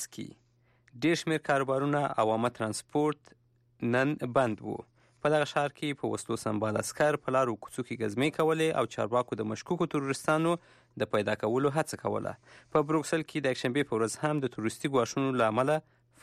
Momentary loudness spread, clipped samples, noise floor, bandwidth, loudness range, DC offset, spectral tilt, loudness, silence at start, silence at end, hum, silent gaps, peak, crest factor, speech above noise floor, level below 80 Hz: 8 LU; under 0.1%; -66 dBFS; 15 kHz; 1 LU; under 0.1%; -5.5 dB/octave; -30 LUFS; 0 s; 0.4 s; none; none; -16 dBFS; 16 dB; 36 dB; -68 dBFS